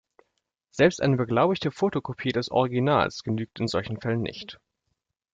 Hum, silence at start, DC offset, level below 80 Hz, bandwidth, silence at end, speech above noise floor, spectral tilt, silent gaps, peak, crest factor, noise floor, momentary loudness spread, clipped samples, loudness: none; 0.75 s; under 0.1%; -58 dBFS; 7.8 kHz; 0.8 s; 54 dB; -6.5 dB/octave; none; -6 dBFS; 20 dB; -79 dBFS; 8 LU; under 0.1%; -25 LUFS